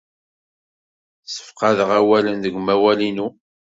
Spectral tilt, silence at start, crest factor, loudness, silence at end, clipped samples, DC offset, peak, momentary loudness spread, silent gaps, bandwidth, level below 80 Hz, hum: -5 dB/octave; 1.3 s; 18 dB; -18 LUFS; 0.4 s; under 0.1%; under 0.1%; -2 dBFS; 15 LU; none; 7.8 kHz; -60 dBFS; none